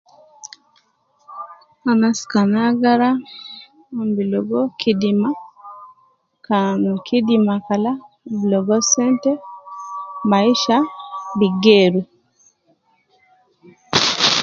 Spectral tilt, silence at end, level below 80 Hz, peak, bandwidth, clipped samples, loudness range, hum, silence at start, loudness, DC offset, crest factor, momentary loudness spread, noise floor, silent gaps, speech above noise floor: -4 dB/octave; 0 s; -62 dBFS; 0 dBFS; 7.8 kHz; under 0.1%; 3 LU; none; 0.45 s; -17 LUFS; under 0.1%; 18 dB; 21 LU; -61 dBFS; none; 45 dB